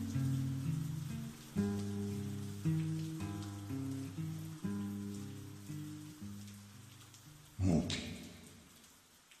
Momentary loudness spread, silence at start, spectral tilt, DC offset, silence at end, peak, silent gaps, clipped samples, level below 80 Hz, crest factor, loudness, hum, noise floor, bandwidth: 19 LU; 0 s; -6.5 dB/octave; under 0.1%; 0 s; -20 dBFS; none; under 0.1%; -62 dBFS; 20 dB; -41 LUFS; none; -63 dBFS; 15 kHz